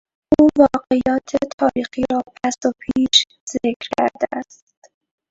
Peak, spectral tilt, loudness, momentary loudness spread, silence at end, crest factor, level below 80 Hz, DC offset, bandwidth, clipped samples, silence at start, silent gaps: 0 dBFS; -3.5 dB/octave; -18 LUFS; 10 LU; 0.85 s; 18 dB; -48 dBFS; under 0.1%; 8 kHz; under 0.1%; 0.3 s; 1.53-1.58 s, 3.40-3.47 s, 3.76-3.80 s